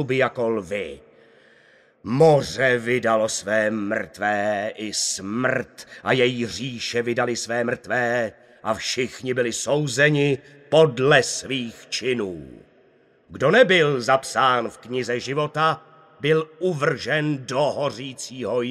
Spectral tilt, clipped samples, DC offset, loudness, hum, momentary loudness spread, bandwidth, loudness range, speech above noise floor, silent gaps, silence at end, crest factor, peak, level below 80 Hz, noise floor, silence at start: -4 dB/octave; under 0.1%; under 0.1%; -22 LUFS; none; 11 LU; 14 kHz; 3 LU; 36 dB; none; 0 s; 20 dB; -2 dBFS; -60 dBFS; -57 dBFS; 0 s